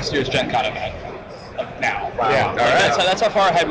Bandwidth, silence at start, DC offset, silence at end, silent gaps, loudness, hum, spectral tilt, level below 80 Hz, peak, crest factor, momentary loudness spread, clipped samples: 8 kHz; 0 s; under 0.1%; 0 s; none; -18 LUFS; none; -4 dB/octave; -44 dBFS; -10 dBFS; 8 dB; 16 LU; under 0.1%